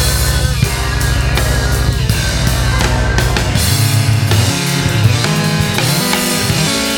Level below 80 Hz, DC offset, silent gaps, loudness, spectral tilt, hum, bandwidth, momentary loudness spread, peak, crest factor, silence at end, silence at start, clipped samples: -20 dBFS; under 0.1%; none; -13 LUFS; -4 dB/octave; none; 18.5 kHz; 3 LU; 0 dBFS; 12 dB; 0 s; 0 s; under 0.1%